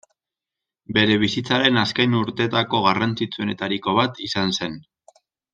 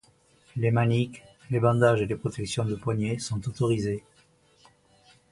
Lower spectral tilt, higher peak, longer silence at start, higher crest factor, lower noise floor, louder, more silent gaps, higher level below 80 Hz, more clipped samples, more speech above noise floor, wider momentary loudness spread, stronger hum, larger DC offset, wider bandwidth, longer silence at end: second, -5 dB/octave vs -6.5 dB/octave; first, -2 dBFS vs -8 dBFS; first, 0.9 s vs 0.55 s; about the same, 20 dB vs 20 dB; first, -87 dBFS vs -62 dBFS; first, -20 LUFS vs -27 LUFS; neither; about the same, -58 dBFS vs -54 dBFS; neither; first, 66 dB vs 36 dB; about the same, 8 LU vs 10 LU; neither; neither; second, 9.2 kHz vs 11.5 kHz; second, 0.75 s vs 1.3 s